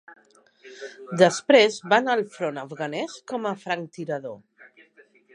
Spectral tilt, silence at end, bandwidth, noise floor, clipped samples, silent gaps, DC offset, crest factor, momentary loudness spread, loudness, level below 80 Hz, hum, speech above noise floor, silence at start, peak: -4 dB/octave; 0.95 s; 11 kHz; -57 dBFS; under 0.1%; none; under 0.1%; 22 dB; 22 LU; -23 LUFS; -80 dBFS; none; 33 dB; 0.1 s; -2 dBFS